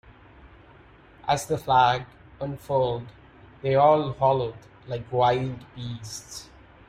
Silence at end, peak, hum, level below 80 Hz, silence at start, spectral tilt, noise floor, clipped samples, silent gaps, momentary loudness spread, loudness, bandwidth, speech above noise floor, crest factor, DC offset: 0.45 s; -6 dBFS; none; -54 dBFS; 0.45 s; -5.5 dB/octave; -52 dBFS; under 0.1%; none; 17 LU; -24 LUFS; 16 kHz; 28 dB; 20 dB; under 0.1%